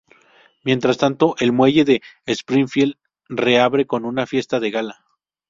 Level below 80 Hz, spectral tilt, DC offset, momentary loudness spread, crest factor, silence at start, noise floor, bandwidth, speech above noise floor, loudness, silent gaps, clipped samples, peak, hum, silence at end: -58 dBFS; -5.5 dB/octave; under 0.1%; 10 LU; 18 dB; 0.65 s; -54 dBFS; 7.6 kHz; 36 dB; -18 LUFS; none; under 0.1%; -2 dBFS; none; 0.6 s